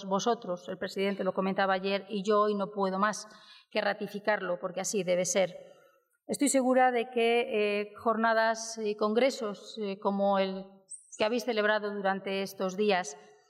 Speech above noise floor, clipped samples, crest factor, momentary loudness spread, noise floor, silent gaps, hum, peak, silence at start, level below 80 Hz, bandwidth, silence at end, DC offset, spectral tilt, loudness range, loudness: 35 dB; under 0.1%; 16 dB; 10 LU; -65 dBFS; none; none; -14 dBFS; 0 s; -84 dBFS; 16 kHz; 0.3 s; under 0.1%; -4 dB/octave; 3 LU; -30 LUFS